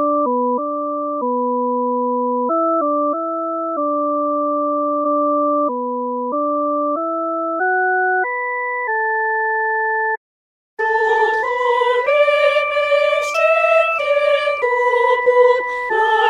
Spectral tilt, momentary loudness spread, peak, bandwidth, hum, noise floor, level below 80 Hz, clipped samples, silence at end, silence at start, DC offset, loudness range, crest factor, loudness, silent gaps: -3 dB/octave; 7 LU; -2 dBFS; 10.5 kHz; none; under -90 dBFS; -64 dBFS; under 0.1%; 0 s; 0 s; under 0.1%; 4 LU; 14 dB; -17 LUFS; 10.17-10.77 s